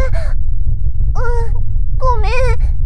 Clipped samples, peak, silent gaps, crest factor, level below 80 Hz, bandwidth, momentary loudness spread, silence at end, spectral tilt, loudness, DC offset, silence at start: under 0.1%; 0 dBFS; none; 10 dB; -14 dBFS; 6.2 kHz; 5 LU; 0 s; -6.5 dB/octave; -19 LUFS; under 0.1%; 0 s